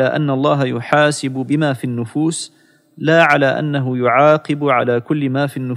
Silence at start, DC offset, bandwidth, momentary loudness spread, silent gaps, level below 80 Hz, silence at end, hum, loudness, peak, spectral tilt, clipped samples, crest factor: 0 s; under 0.1%; 14 kHz; 9 LU; none; -68 dBFS; 0 s; none; -16 LUFS; -2 dBFS; -6 dB/octave; under 0.1%; 14 dB